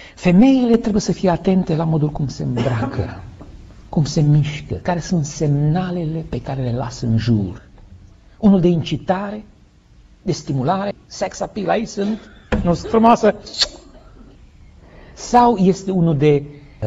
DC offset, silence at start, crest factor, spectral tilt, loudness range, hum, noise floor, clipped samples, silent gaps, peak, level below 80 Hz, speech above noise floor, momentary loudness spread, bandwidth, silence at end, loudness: under 0.1%; 0 s; 16 dB; -6.5 dB/octave; 4 LU; none; -48 dBFS; under 0.1%; none; -2 dBFS; -38 dBFS; 31 dB; 13 LU; 8 kHz; 0 s; -18 LUFS